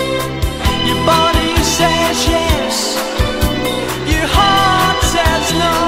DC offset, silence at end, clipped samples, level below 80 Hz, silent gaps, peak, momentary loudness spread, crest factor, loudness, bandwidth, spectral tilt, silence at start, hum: under 0.1%; 0 s; under 0.1%; -24 dBFS; none; 0 dBFS; 6 LU; 14 dB; -13 LUFS; 16.5 kHz; -3.5 dB/octave; 0 s; none